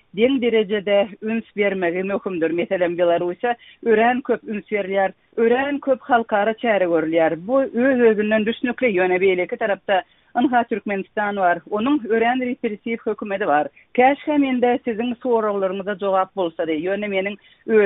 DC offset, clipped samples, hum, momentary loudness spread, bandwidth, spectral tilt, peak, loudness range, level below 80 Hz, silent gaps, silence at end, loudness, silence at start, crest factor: under 0.1%; under 0.1%; none; 7 LU; 4 kHz; -3.5 dB/octave; -2 dBFS; 3 LU; -62 dBFS; none; 0 s; -20 LUFS; 0.15 s; 16 dB